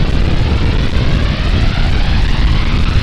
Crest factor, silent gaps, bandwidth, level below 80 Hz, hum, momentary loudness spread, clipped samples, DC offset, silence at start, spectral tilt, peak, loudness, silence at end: 10 dB; none; 9.4 kHz; -14 dBFS; none; 1 LU; under 0.1%; under 0.1%; 0 s; -6.5 dB/octave; 0 dBFS; -15 LUFS; 0 s